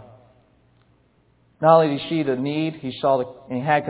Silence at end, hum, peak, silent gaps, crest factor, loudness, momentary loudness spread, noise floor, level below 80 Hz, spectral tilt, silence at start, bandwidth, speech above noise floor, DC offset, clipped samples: 0 s; none; -2 dBFS; none; 20 dB; -21 LUFS; 11 LU; -60 dBFS; -64 dBFS; -10.5 dB/octave; 0 s; 4 kHz; 40 dB; under 0.1%; under 0.1%